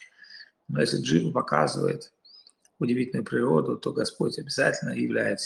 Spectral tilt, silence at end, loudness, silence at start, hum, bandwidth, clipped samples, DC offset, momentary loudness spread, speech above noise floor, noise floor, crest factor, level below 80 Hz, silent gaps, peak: -5.5 dB/octave; 0 s; -26 LUFS; 0 s; none; 12 kHz; under 0.1%; under 0.1%; 16 LU; 30 dB; -56 dBFS; 20 dB; -66 dBFS; none; -6 dBFS